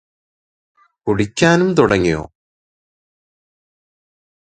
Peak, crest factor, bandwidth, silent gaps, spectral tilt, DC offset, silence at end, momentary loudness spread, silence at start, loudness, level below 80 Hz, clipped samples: 0 dBFS; 20 dB; 9.4 kHz; none; -5.5 dB/octave; under 0.1%; 2.2 s; 10 LU; 1.05 s; -15 LUFS; -44 dBFS; under 0.1%